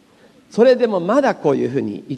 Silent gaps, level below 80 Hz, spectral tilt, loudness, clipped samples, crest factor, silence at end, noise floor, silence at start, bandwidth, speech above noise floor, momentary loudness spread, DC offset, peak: none; -66 dBFS; -6.5 dB/octave; -17 LUFS; under 0.1%; 16 dB; 0 s; -50 dBFS; 0.55 s; 10 kHz; 34 dB; 9 LU; under 0.1%; -2 dBFS